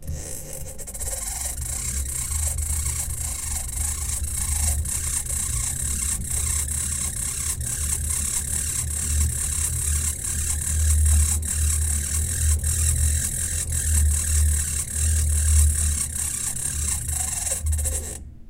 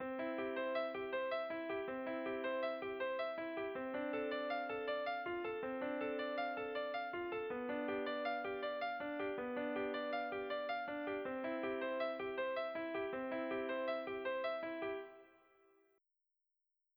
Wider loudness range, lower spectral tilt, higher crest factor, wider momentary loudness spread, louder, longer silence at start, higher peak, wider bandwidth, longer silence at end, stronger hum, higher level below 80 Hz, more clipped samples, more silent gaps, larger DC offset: first, 4 LU vs 1 LU; second, -2.5 dB/octave vs -6.5 dB/octave; about the same, 18 dB vs 14 dB; first, 6 LU vs 2 LU; first, -23 LUFS vs -42 LUFS; about the same, 0 s vs 0 s; first, -4 dBFS vs -28 dBFS; second, 16.5 kHz vs over 20 kHz; second, 0 s vs 1.7 s; neither; first, -28 dBFS vs -78 dBFS; neither; neither; neither